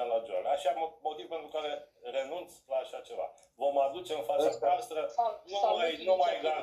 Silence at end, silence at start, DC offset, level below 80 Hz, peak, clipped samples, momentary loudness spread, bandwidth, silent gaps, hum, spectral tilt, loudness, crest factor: 0 s; 0 s; under 0.1%; -76 dBFS; -16 dBFS; under 0.1%; 12 LU; 14 kHz; none; none; -3 dB/octave; -33 LUFS; 16 dB